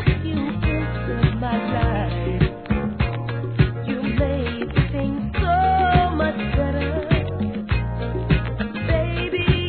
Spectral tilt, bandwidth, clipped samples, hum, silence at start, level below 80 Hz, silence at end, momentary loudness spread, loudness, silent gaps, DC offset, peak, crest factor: -11 dB/octave; 4.5 kHz; under 0.1%; none; 0 s; -28 dBFS; 0 s; 7 LU; -22 LUFS; none; 0.3%; -2 dBFS; 18 dB